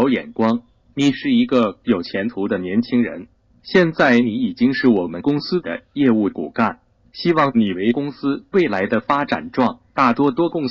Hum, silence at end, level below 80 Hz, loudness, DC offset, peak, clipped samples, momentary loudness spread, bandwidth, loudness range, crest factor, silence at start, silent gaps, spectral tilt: none; 0 s; -56 dBFS; -19 LUFS; under 0.1%; 0 dBFS; under 0.1%; 7 LU; 7.4 kHz; 2 LU; 18 dB; 0 s; none; -7 dB/octave